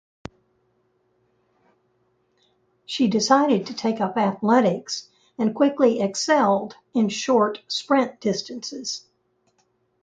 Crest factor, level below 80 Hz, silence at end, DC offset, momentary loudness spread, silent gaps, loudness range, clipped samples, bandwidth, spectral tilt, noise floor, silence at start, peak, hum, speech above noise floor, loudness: 20 dB; -66 dBFS; 1.05 s; under 0.1%; 13 LU; none; 4 LU; under 0.1%; 9.2 kHz; -4.5 dB/octave; -68 dBFS; 2.9 s; -4 dBFS; none; 47 dB; -22 LUFS